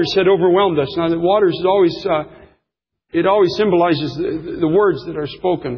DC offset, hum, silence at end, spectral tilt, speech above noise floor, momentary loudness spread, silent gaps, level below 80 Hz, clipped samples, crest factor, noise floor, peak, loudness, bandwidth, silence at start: under 0.1%; none; 0 s; -7 dB/octave; 62 dB; 9 LU; none; -48 dBFS; under 0.1%; 12 dB; -78 dBFS; -4 dBFS; -16 LUFS; 6.8 kHz; 0 s